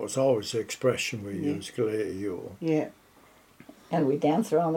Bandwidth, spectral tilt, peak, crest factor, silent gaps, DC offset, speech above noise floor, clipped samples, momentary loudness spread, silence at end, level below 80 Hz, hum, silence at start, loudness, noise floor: 17 kHz; -5.5 dB/octave; -12 dBFS; 18 dB; none; under 0.1%; 30 dB; under 0.1%; 8 LU; 0 s; -70 dBFS; none; 0 s; -28 LUFS; -58 dBFS